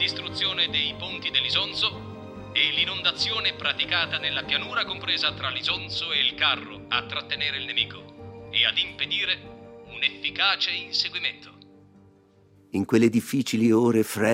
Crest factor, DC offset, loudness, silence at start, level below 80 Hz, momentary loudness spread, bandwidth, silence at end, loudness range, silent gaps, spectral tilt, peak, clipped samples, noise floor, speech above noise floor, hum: 20 dB; under 0.1%; -24 LUFS; 0 s; -60 dBFS; 9 LU; 16 kHz; 0 s; 2 LU; none; -4 dB/octave; -8 dBFS; under 0.1%; -57 dBFS; 31 dB; none